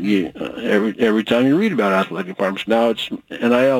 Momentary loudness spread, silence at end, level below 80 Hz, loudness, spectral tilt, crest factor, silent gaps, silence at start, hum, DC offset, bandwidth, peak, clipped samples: 9 LU; 0 s; -58 dBFS; -18 LUFS; -6 dB/octave; 16 dB; none; 0 s; none; under 0.1%; 17 kHz; -2 dBFS; under 0.1%